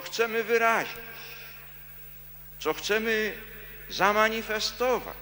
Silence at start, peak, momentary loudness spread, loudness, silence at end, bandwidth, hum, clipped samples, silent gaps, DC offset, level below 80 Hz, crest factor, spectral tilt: 0 s; -8 dBFS; 19 LU; -26 LUFS; 0 s; 17 kHz; 50 Hz at -55 dBFS; under 0.1%; none; under 0.1%; -54 dBFS; 22 dB; -2.5 dB/octave